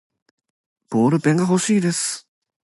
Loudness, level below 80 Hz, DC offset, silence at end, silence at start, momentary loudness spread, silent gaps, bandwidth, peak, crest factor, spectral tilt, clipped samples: -19 LUFS; -66 dBFS; under 0.1%; 0.45 s; 0.9 s; 8 LU; none; 11.5 kHz; -6 dBFS; 16 dB; -5 dB/octave; under 0.1%